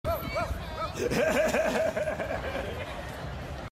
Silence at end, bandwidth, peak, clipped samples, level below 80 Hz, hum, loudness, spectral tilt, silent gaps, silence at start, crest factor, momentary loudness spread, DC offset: 0 s; 16 kHz; -14 dBFS; under 0.1%; -44 dBFS; none; -30 LUFS; -5 dB/octave; none; 0.05 s; 16 dB; 12 LU; under 0.1%